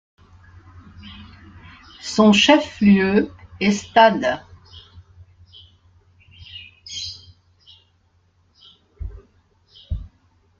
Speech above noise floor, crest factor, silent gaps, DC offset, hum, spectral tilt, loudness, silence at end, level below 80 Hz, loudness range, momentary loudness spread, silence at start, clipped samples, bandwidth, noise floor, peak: 44 dB; 22 dB; none; under 0.1%; none; -5 dB/octave; -17 LUFS; 0.55 s; -46 dBFS; 21 LU; 25 LU; 1 s; under 0.1%; 7.8 kHz; -61 dBFS; -2 dBFS